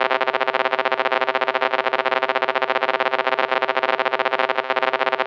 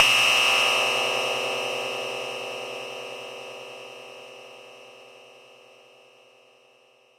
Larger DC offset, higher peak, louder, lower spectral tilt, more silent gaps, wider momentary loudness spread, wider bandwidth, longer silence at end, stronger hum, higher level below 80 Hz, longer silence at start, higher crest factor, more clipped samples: neither; about the same, -4 dBFS vs -2 dBFS; first, -20 LUFS vs -23 LUFS; first, -3 dB/octave vs 0 dB/octave; neither; second, 1 LU vs 26 LU; second, 7.6 kHz vs 16.5 kHz; second, 0 s vs 1.8 s; neither; second, under -90 dBFS vs -70 dBFS; about the same, 0 s vs 0 s; second, 16 dB vs 26 dB; neither